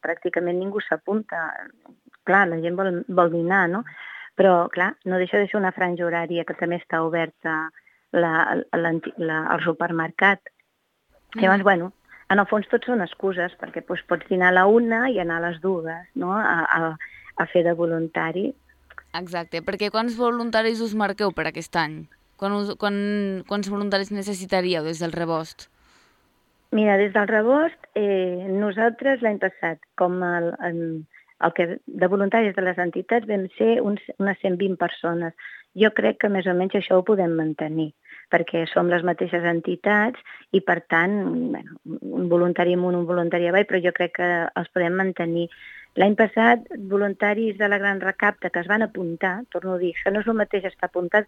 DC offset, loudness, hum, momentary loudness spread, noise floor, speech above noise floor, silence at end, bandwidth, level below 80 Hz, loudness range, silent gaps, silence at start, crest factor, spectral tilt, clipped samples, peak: under 0.1%; -22 LUFS; none; 10 LU; -70 dBFS; 48 dB; 0.05 s; 12.5 kHz; -64 dBFS; 4 LU; none; 0.05 s; 20 dB; -6.5 dB/octave; under 0.1%; -2 dBFS